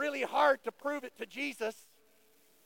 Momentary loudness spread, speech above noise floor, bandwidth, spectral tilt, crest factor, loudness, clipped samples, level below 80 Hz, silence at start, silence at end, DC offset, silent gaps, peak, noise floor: 12 LU; 34 dB; 17 kHz; -2.5 dB/octave; 20 dB; -33 LUFS; under 0.1%; -86 dBFS; 0 s; 0.95 s; under 0.1%; none; -16 dBFS; -68 dBFS